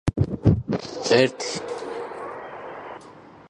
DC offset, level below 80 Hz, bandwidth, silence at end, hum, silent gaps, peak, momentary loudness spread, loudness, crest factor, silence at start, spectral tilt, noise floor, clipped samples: under 0.1%; -40 dBFS; 10.5 kHz; 0 s; none; none; -4 dBFS; 18 LU; -24 LUFS; 20 dB; 0.05 s; -5.5 dB/octave; -46 dBFS; under 0.1%